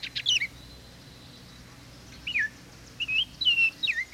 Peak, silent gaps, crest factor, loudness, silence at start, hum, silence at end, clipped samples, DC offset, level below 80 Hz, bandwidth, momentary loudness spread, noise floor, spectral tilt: -14 dBFS; none; 16 dB; -25 LUFS; 0 s; none; 0 s; under 0.1%; under 0.1%; -56 dBFS; 16.5 kHz; 26 LU; -48 dBFS; 0 dB/octave